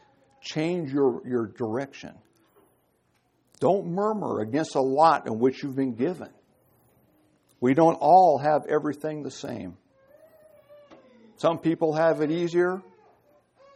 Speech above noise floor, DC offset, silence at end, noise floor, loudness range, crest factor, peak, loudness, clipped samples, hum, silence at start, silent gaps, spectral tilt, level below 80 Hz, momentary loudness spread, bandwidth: 45 dB; under 0.1%; 0.95 s; -69 dBFS; 7 LU; 20 dB; -6 dBFS; -24 LUFS; under 0.1%; none; 0.45 s; none; -7 dB/octave; -72 dBFS; 16 LU; 12 kHz